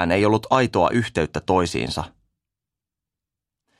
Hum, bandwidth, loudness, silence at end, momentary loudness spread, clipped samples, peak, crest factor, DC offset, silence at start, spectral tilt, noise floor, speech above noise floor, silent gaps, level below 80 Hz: none; 13 kHz; -21 LUFS; 1.7 s; 9 LU; under 0.1%; -2 dBFS; 20 dB; under 0.1%; 0 s; -5.5 dB/octave; -87 dBFS; 67 dB; none; -46 dBFS